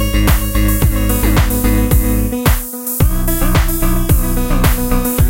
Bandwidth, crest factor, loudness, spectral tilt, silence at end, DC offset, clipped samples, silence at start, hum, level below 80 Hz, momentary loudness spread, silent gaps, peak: 17.5 kHz; 12 dB; -15 LUFS; -5.5 dB/octave; 0 s; 0.4%; under 0.1%; 0 s; none; -16 dBFS; 3 LU; none; 0 dBFS